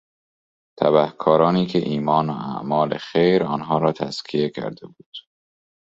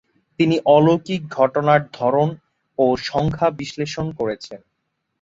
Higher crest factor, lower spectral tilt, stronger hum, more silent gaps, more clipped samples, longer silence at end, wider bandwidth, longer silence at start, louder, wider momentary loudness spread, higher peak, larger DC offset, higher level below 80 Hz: about the same, 20 dB vs 18 dB; about the same, -7.5 dB/octave vs -7 dB/octave; neither; first, 5.06-5.12 s vs none; neither; about the same, 0.75 s vs 0.65 s; about the same, 7.8 kHz vs 7.8 kHz; first, 0.8 s vs 0.4 s; about the same, -20 LUFS vs -19 LUFS; first, 17 LU vs 12 LU; about the same, -2 dBFS vs -2 dBFS; neither; second, -60 dBFS vs -52 dBFS